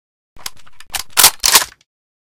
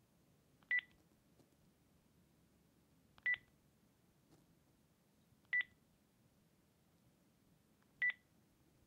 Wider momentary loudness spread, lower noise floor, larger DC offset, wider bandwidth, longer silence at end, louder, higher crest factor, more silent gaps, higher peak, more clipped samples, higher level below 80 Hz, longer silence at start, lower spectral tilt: first, 23 LU vs 5 LU; second, -34 dBFS vs -75 dBFS; neither; first, over 20 kHz vs 15.5 kHz; second, 0.5 s vs 0.75 s; first, -10 LUFS vs -41 LUFS; about the same, 18 dB vs 22 dB; neither; first, 0 dBFS vs -28 dBFS; first, 0.4% vs under 0.1%; first, -46 dBFS vs -86 dBFS; first, 0.95 s vs 0.7 s; second, 2 dB/octave vs -2.5 dB/octave